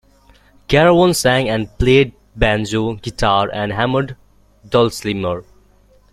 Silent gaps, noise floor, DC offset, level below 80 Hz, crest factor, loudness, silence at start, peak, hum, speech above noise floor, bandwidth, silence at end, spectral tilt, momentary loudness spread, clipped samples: none; -51 dBFS; under 0.1%; -34 dBFS; 16 dB; -16 LUFS; 0.7 s; 0 dBFS; 50 Hz at -45 dBFS; 36 dB; 15 kHz; 0.7 s; -5 dB/octave; 9 LU; under 0.1%